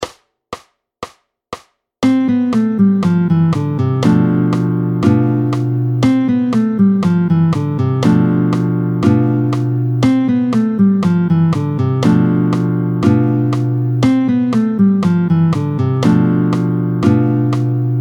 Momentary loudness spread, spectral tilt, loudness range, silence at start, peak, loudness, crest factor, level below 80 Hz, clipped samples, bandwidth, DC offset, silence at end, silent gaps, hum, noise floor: 4 LU; -8.5 dB/octave; 1 LU; 0 s; 0 dBFS; -14 LUFS; 14 dB; -50 dBFS; under 0.1%; 10 kHz; under 0.1%; 0 s; none; none; -34 dBFS